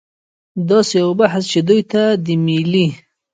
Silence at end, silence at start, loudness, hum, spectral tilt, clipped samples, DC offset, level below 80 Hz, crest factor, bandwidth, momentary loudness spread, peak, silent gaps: 0.35 s; 0.55 s; -15 LUFS; none; -6 dB/octave; under 0.1%; under 0.1%; -60 dBFS; 16 dB; 9.4 kHz; 5 LU; 0 dBFS; none